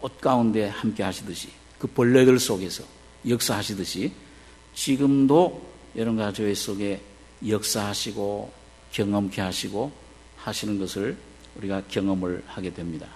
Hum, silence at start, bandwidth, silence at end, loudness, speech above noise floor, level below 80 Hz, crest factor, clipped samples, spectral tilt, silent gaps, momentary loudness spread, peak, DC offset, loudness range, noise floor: none; 0 s; 13.5 kHz; 0 s; -25 LUFS; 24 dB; -54 dBFS; 22 dB; under 0.1%; -5 dB/octave; none; 17 LU; -4 dBFS; under 0.1%; 6 LU; -49 dBFS